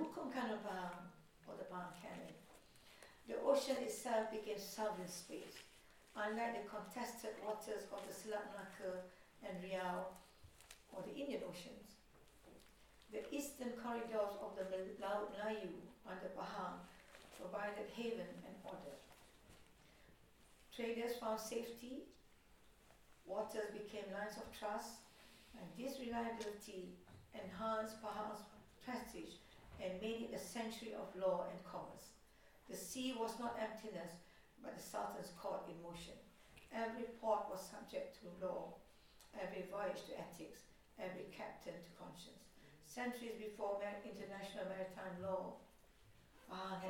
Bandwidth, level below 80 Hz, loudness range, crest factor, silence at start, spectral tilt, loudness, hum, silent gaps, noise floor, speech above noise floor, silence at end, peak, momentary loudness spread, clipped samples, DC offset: 18 kHz; -74 dBFS; 6 LU; 24 dB; 0 s; -4 dB/octave; -47 LUFS; none; none; -69 dBFS; 22 dB; 0 s; -24 dBFS; 19 LU; under 0.1%; under 0.1%